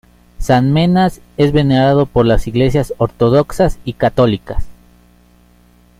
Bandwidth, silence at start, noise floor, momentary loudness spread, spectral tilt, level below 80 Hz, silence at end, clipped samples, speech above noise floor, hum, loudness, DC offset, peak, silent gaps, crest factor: 15.5 kHz; 0.4 s; -48 dBFS; 7 LU; -7.5 dB/octave; -28 dBFS; 1.3 s; under 0.1%; 35 dB; 60 Hz at -35 dBFS; -14 LUFS; under 0.1%; 0 dBFS; none; 14 dB